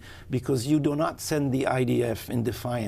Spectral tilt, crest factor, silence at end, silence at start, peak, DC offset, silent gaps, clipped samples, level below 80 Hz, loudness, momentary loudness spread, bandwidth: -6 dB/octave; 16 dB; 0 s; 0 s; -10 dBFS; under 0.1%; none; under 0.1%; -52 dBFS; -27 LUFS; 5 LU; 16 kHz